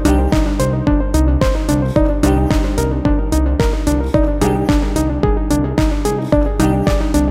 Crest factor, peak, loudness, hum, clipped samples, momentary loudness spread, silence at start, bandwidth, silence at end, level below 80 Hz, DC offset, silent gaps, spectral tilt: 14 dB; 0 dBFS; -16 LUFS; none; under 0.1%; 2 LU; 0 s; 15.5 kHz; 0 s; -18 dBFS; under 0.1%; none; -6.5 dB/octave